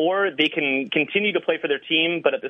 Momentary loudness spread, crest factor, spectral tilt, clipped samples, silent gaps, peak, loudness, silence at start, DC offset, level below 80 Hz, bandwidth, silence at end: 4 LU; 18 dB; -6 dB/octave; under 0.1%; none; -4 dBFS; -21 LUFS; 0 s; under 0.1%; -74 dBFS; 6.4 kHz; 0 s